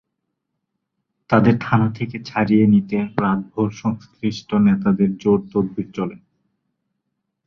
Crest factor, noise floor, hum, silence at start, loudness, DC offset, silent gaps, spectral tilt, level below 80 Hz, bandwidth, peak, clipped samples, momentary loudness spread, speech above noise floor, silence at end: 18 dB; -77 dBFS; none; 1.3 s; -19 LUFS; under 0.1%; none; -8.5 dB/octave; -54 dBFS; 6.6 kHz; -2 dBFS; under 0.1%; 10 LU; 59 dB; 1.3 s